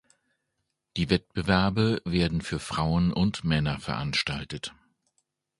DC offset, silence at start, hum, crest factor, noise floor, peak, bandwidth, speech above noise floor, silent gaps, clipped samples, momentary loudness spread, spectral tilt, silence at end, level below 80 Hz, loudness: under 0.1%; 0.95 s; none; 22 dB; -80 dBFS; -6 dBFS; 11.5 kHz; 54 dB; none; under 0.1%; 10 LU; -6 dB/octave; 0.9 s; -44 dBFS; -27 LUFS